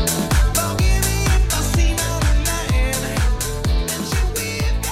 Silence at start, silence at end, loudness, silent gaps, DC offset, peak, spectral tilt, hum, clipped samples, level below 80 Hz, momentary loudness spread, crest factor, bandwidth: 0 s; 0 s; -19 LUFS; none; under 0.1%; -6 dBFS; -4 dB/octave; none; under 0.1%; -20 dBFS; 4 LU; 12 dB; 16.5 kHz